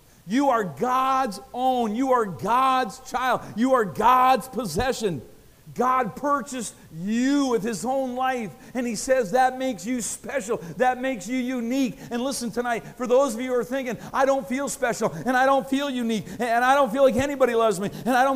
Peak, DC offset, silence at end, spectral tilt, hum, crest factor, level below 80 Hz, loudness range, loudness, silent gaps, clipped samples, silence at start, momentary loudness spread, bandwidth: -6 dBFS; under 0.1%; 0 s; -4.5 dB/octave; none; 16 dB; -52 dBFS; 4 LU; -24 LUFS; none; under 0.1%; 0.25 s; 9 LU; 15.5 kHz